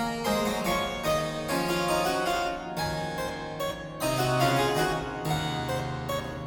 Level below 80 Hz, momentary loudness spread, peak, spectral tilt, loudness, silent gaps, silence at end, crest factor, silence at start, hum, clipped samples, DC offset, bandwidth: -48 dBFS; 8 LU; -12 dBFS; -4.5 dB/octave; -28 LUFS; none; 0 s; 16 dB; 0 s; none; under 0.1%; under 0.1%; 17.5 kHz